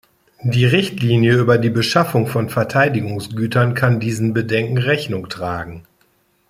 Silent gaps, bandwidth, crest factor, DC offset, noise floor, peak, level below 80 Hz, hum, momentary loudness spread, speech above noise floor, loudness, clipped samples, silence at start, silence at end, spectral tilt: none; 15.5 kHz; 16 dB; under 0.1%; -60 dBFS; 0 dBFS; -52 dBFS; none; 11 LU; 43 dB; -17 LUFS; under 0.1%; 0.4 s; 0.7 s; -6.5 dB/octave